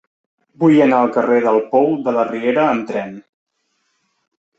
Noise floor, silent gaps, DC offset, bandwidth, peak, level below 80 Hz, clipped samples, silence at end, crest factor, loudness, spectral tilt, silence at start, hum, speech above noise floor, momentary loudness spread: -68 dBFS; none; under 0.1%; 8 kHz; -2 dBFS; -64 dBFS; under 0.1%; 1.4 s; 16 dB; -15 LUFS; -8 dB/octave; 0.6 s; none; 53 dB; 10 LU